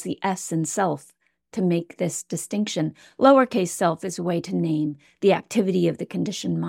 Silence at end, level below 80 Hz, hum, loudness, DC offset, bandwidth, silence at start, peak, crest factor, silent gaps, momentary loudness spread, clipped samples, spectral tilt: 0 s; -68 dBFS; none; -23 LUFS; under 0.1%; 16.5 kHz; 0 s; -4 dBFS; 20 dB; none; 10 LU; under 0.1%; -5.5 dB/octave